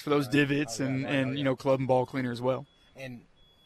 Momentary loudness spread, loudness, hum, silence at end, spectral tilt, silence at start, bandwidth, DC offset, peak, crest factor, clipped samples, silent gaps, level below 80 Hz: 18 LU; -28 LUFS; none; 0.45 s; -6 dB/octave; 0 s; 14 kHz; under 0.1%; -12 dBFS; 16 dB; under 0.1%; none; -62 dBFS